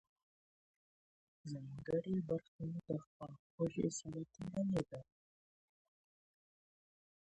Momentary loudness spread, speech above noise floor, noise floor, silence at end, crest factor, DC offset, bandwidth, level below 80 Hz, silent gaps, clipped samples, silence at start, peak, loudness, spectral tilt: 15 LU; over 48 dB; under -90 dBFS; 2.2 s; 20 dB; under 0.1%; 10.5 kHz; -72 dBFS; 2.48-2.59 s, 3.07-3.20 s, 3.39-3.58 s; under 0.1%; 1.45 s; -24 dBFS; -43 LUFS; -7 dB/octave